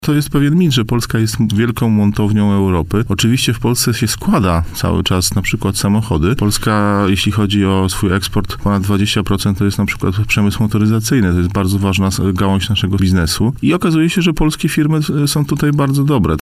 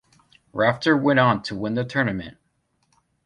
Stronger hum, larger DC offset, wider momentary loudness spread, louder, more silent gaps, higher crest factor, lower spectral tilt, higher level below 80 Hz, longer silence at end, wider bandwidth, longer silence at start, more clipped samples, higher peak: neither; neither; second, 3 LU vs 15 LU; first, -14 LUFS vs -21 LUFS; neither; second, 12 dB vs 20 dB; second, -5.5 dB/octave vs -7 dB/octave; first, -30 dBFS vs -56 dBFS; second, 0 s vs 0.95 s; first, 16 kHz vs 10.5 kHz; second, 0 s vs 0.55 s; neither; first, 0 dBFS vs -4 dBFS